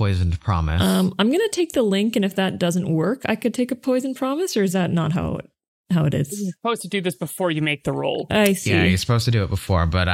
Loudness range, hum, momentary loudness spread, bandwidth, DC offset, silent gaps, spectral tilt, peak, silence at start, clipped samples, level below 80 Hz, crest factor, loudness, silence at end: 3 LU; none; 6 LU; 16.5 kHz; under 0.1%; 5.68-5.84 s; -5.5 dB/octave; -4 dBFS; 0 s; under 0.1%; -38 dBFS; 16 dB; -21 LUFS; 0 s